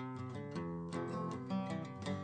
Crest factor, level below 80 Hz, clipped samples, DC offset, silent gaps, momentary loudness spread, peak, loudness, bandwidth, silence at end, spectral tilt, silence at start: 14 dB; -70 dBFS; under 0.1%; under 0.1%; none; 4 LU; -28 dBFS; -42 LUFS; 9 kHz; 0 s; -7 dB/octave; 0 s